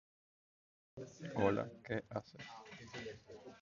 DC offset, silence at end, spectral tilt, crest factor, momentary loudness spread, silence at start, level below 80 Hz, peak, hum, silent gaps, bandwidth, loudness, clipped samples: under 0.1%; 0 s; -5.5 dB/octave; 26 dB; 19 LU; 0.95 s; -70 dBFS; -18 dBFS; none; none; 7.2 kHz; -42 LUFS; under 0.1%